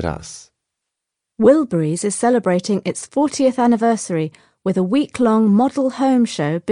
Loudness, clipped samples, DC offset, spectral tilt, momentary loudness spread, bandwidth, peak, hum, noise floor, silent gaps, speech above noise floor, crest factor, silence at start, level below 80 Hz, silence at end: -17 LUFS; under 0.1%; under 0.1%; -6 dB/octave; 10 LU; 10.5 kHz; -2 dBFS; none; -81 dBFS; none; 64 dB; 16 dB; 0 s; -50 dBFS; 0 s